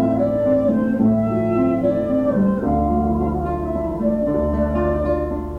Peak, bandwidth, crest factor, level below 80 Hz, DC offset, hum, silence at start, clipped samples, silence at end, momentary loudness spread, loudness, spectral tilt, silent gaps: -6 dBFS; 4.5 kHz; 12 dB; -32 dBFS; under 0.1%; none; 0 s; under 0.1%; 0 s; 4 LU; -19 LUFS; -10.5 dB/octave; none